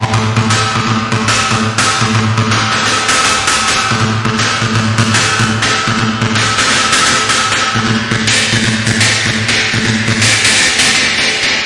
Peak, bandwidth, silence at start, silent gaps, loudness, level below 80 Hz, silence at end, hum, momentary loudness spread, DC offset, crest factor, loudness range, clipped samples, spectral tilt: 0 dBFS; 11.5 kHz; 0 s; none; -10 LUFS; -38 dBFS; 0 s; none; 4 LU; under 0.1%; 12 dB; 2 LU; under 0.1%; -3 dB/octave